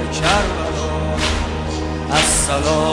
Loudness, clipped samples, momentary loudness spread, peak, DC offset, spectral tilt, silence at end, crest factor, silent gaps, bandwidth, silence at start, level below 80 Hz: -18 LUFS; under 0.1%; 8 LU; -2 dBFS; under 0.1%; -3.5 dB/octave; 0 s; 16 dB; none; 11.5 kHz; 0 s; -28 dBFS